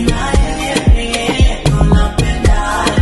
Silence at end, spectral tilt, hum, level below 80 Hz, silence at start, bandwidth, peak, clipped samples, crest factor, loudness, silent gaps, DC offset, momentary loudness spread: 0 s; -5.5 dB/octave; none; -14 dBFS; 0 s; 12 kHz; 0 dBFS; under 0.1%; 12 dB; -14 LUFS; none; under 0.1%; 3 LU